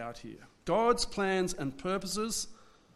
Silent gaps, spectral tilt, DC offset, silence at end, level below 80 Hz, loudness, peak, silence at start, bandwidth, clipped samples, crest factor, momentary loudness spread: none; -3.5 dB/octave; under 0.1%; 0.3 s; -54 dBFS; -32 LUFS; -14 dBFS; 0 s; 14 kHz; under 0.1%; 20 dB; 16 LU